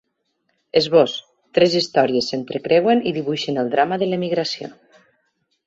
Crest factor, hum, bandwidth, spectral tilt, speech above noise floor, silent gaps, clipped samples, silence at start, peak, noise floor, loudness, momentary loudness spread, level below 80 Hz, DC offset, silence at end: 18 dB; none; 7.8 kHz; -5 dB/octave; 52 dB; none; under 0.1%; 0.75 s; -2 dBFS; -71 dBFS; -19 LUFS; 10 LU; -62 dBFS; under 0.1%; 0.95 s